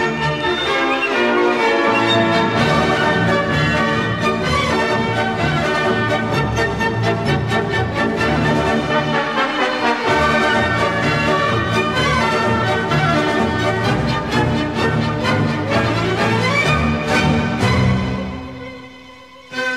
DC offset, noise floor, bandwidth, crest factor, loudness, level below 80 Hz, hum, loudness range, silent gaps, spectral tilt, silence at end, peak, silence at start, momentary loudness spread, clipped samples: 0.2%; -40 dBFS; 14 kHz; 14 dB; -17 LUFS; -36 dBFS; none; 2 LU; none; -5.5 dB/octave; 0 s; -2 dBFS; 0 s; 4 LU; under 0.1%